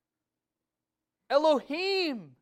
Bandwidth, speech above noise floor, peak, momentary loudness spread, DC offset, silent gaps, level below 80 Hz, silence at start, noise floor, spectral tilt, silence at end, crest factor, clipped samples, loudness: 12.5 kHz; 62 dB; -12 dBFS; 5 LU; under 0.1%; none; -78 dBFS; 1.3 s; -89 dBFS; -4 dB/octave; 0.15 s; 20 dB; under 0.1%; -28 LUFS